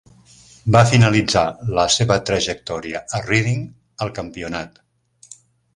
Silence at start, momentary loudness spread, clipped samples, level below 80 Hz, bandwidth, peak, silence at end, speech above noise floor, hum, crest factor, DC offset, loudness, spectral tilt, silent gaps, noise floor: 0.65 s; 15 LU; under 0.1%; -44 dBFS; 11.5 kHz; 0 dBFS; 0.4 s; 30 dB; none; 20 dB; under 0.1%; -19 LUFS; -4.5 dB/octave; none; -48 dBFS